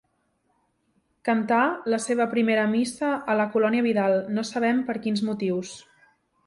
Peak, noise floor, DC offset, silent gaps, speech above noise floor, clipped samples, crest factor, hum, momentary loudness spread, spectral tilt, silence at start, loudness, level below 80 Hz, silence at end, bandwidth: -10 dBFS; -71 dBFS; under 0.1%; none; 47 dB; under 0.1%; 14 dB; none; 6 LU; -5 dB/octave; 1.25 s; -24 LUFS; -68 dBFS; 0.65 s; 11.5 kHz